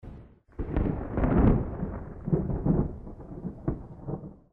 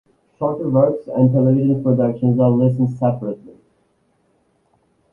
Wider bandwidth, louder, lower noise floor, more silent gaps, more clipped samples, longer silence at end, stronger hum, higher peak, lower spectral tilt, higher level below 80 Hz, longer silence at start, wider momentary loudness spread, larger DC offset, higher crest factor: first, 3.7 kHz vs 3.1 kHz; second, -30 LUFS vs -17 LUFS; second, -49 dBFS vs -62 dBFS; neither; neither; second, 0.15 s vs 1.6 s; neither; second, -8 dBFS vs -2 dBFS; about the same, -12 dB/octave vs -12.5 dB/octave; first, -34 dBFS vs -52 dBFS; second, 0.05 s vs 0.4 s; first, 17 LU vs 9 LU; neither; about the same, 20 dB vs 16 dB